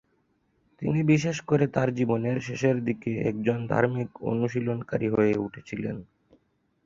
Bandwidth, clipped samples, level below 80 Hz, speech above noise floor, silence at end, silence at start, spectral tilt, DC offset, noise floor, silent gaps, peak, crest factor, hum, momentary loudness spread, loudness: 7.6 kHz; under 0.1%; -58 dBFS; 44 dB; 0.8 s; 0.8 s; -7.5 dB/octave; under 0.1%; -70 dBFS; none; -8 dBFS; 20 dB; none; 10 LU; -27 LUFS